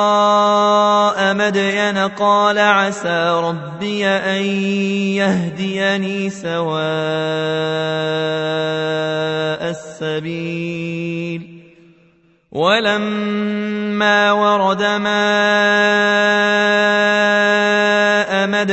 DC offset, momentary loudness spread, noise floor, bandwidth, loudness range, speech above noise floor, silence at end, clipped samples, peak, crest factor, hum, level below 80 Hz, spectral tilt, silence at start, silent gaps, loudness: under 0.1%; 10 LU; -54 dBFS; 8.4 kHz; 8 LU; 38 dB; 0 s; under 0.1%; 0 dBFS; 16 dB; none; -62 dBFS; -4.5 dB/octave; 0 s; none; -16 LUFS